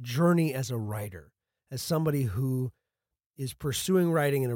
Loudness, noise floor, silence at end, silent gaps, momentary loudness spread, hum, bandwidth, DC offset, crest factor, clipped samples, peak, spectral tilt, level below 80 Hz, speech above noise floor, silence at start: -29 LUFS; -89 dBFS; 0 s; 3.26-3.30 s; 14 LU; none; 17 kHz; under 0.1%; 14 dB; under 0.1%; -14 dBFS; -6 dB/octave; -60 dBFS; 61 dB; 0 s